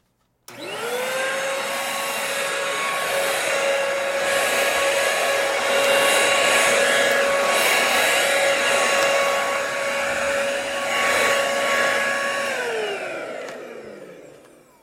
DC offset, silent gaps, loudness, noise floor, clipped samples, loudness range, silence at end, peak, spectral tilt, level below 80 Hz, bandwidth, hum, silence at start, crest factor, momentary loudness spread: under 0.1%; none; -20 LUFS; -51 dBFS; under 0.1%; 6 LU; 0.45 s; -4 dBFS; -0.5 dB/octave; -62 dBFS; 16.5 kHz; none; 0.5 s; 18 dB; 11 LU